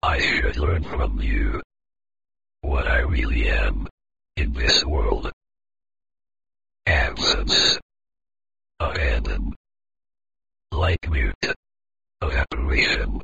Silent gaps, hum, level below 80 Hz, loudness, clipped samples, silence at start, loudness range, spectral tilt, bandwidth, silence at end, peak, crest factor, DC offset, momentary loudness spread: 1.64-1.70 s, 3.91-3.98 s, 5.33-5.41 s, 7.82-7.89 s, 9.56-9.64 s, 11.35-11.41 s, 11.56-11.63 s; none; -26 dBFS; -22 LUFS; under 0.1%; 0 s; 5 LU; -4 dB/octave; 7.8 kHz; 0 s; -4 dBFS; 18 dB; 1%; 14 LU